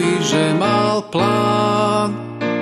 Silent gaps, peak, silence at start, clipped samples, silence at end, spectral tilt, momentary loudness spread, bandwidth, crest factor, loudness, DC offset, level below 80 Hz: none; -2 dBFS; 0 s; under 0.1%; 0 s; -5 dB/octave; 6 LU; 12 kHz; 14 dB; -17 LUFS; under 0.1%; -58 dBFS